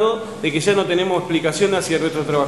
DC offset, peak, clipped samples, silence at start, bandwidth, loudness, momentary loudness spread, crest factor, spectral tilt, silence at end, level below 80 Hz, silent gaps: 0.3%; -4 dBFS; under 0.1%; 0 s; 12.5 kHz; -19 LUFS; 3 LU; 14 dB; -4.5 dB/octave; 0 s; -58 dBFS; none